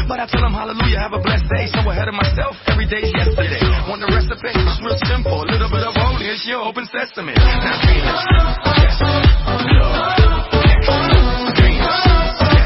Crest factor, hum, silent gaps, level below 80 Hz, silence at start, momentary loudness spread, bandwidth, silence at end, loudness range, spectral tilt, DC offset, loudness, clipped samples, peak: 14 dB; none; none; -18 dBFS; 0 s; 6 LU; 5.8 kHz; 0 s; 4 LU; -9 dB/octave; under 0.1%; -16 LUFS; under 0.1%; 0 dBFS